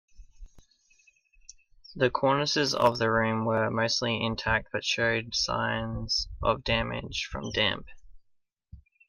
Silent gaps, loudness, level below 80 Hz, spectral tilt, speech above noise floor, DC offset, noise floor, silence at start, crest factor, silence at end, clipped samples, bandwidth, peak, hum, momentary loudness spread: none; -27 LUFS; -48 dBFS; -4 dB/octave; 42 dB; under 0.1%; -70 dBFS; 0.15 s; 20 dB; 0.3 s; under 0.1%; 15.5 kHz; -8 dBFS; none; 8 LU